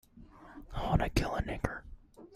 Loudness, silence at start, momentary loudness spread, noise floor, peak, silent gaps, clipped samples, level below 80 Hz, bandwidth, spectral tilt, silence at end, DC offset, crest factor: -34 LUFS; 0.15 s; 23 LU; -55 dBFS; -12 dBFS; none; under 0.1%; -42 dBFS; 15 kHz; -6 dB/octave; 0 s; under 0.1%; 24 dB